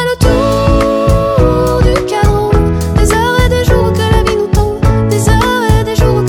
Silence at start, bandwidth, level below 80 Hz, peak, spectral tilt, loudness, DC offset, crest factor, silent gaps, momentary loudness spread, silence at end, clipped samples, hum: 0 s; 18 kHz; -16 dBFS; 0 dBFS; -6 dB/octave; -11 LUFS; under 0.1%; 10 dB; none; 2 LU; 0 s; under 0.1%; none